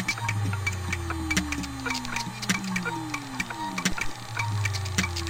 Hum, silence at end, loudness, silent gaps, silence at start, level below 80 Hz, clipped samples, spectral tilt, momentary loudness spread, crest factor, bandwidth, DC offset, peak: none; 0 s; -29 LUFS; none; 0 s; -44 dBFS; under 0.1%; -3.5 dB/octave; 5 LU; 20 dB; 17 kHz; under 0.1%; -8 dBFS